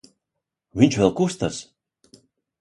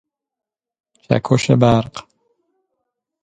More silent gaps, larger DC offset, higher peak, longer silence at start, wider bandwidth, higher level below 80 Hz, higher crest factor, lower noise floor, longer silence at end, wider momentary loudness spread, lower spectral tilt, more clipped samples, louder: neither; neither; about the same, -2 dBFS vs 0 dBFS; second, 0.75 s vs 1.1 s; first, 11.5 kHz vs 9.2 kHz; second, -52 dBFS vs -46 dBFS; about the same, 22 dB vs 20 dB; first, -83 dBFS vs -76 dBFS; second, 1 s vs 1.25 s; about the same, 16 LU vs 16 LU; about the same, -6 dB/octave vs -6.5 dB/octave; neither; second, -21 LUFS vs -16 LUFS